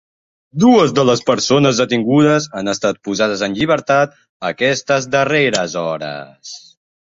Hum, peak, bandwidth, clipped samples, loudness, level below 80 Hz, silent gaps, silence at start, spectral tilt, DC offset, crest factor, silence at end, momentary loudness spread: none; -2 dBFS; 8 kHz; under 0.1%; -15 LUFS; -54 dBFS; 4.29-4.40 s; 0.55 s; -4.5 dB/octave; under 0.1%; 14 dB; 0.55 s; 15 LU